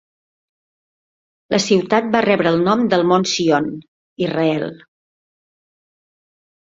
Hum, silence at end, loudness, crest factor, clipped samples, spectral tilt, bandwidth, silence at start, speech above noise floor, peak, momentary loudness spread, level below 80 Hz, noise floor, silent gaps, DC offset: none; 1.95 s; -17 LUFS; 20 dB; under 0.1%; -5 dB/octave; 8 kHz; 1.5 s; over 74 dB; 0 dBFS; 9 LU; -60 dBFS; under -90 dBFS; 3.88-4.16 s; under 0.1%